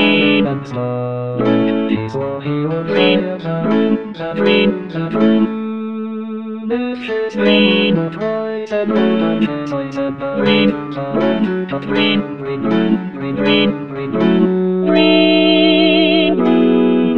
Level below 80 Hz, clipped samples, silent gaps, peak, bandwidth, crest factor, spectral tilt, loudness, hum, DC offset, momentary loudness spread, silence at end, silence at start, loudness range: -52 dBFS; under 0.1%; none; 0 dBFS; 6.4 kHz; 14 dB; -7.5 dB/octave; -15 LUFS; none; 0.6%; 10 LU; 0 s; 0 s; 5 LU